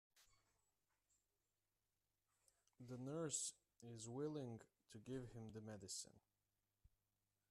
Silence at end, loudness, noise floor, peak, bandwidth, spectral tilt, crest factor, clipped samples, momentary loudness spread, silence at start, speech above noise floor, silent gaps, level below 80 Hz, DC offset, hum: 1.3 s; -52 LUFS; under -90 dBFS; -34 dBFS; 13 kHz; -4 dB/octave; 22 dB; under 0.1%; 16 LU; 0.15 s; over 38 dB; none; -82 dBFS; under 0.1%; none